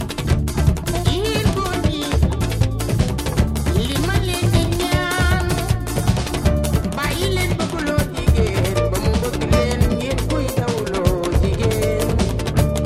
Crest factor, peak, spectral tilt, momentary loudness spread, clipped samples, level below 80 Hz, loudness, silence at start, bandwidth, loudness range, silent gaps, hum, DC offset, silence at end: 16 dB; -2 dBFS; -5.5 dB/octave; 3 LU; under 0.1%; -24 dBFS; -19 LUFS; 0 s; 16 kHz; 1 LU; none; none; under 0.1%; 0 s